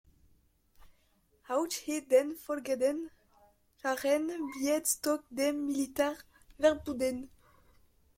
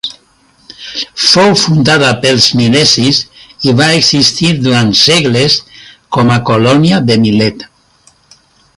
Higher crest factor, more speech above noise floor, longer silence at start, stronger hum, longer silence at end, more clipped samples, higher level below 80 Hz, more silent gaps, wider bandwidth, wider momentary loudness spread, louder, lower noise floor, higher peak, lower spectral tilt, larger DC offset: first, 20 dB vs 10 dB; about the same, 38 dB vs 40 dB; first, 1.5 s vs 0.05 s; neither; second, 0.9 s vs 1.15 s; neither; second, -66 dBFS vs -44 dBFS; neither; about the same, 16.5 kHz vs 16 kHz; about the same, 10 LU vs 11 LU; second, -32 LUFS vs -8 LUFS; first, -70 dBFS vs -48 dBFS; second, -12 dBFS vs 0 dBFS; second, -2.5 dB/octave vs -4 dB/octave; neither